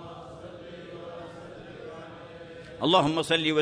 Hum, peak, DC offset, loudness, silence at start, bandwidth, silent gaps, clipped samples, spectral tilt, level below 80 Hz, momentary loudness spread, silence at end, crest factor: none; -6 dBFS; under 0.1%; -24 LUFS; 0 s; 11 kHz; none; under 0.1%; -5 dB/octave; -60 dBFS; 21 LU; 0 s; 24 dB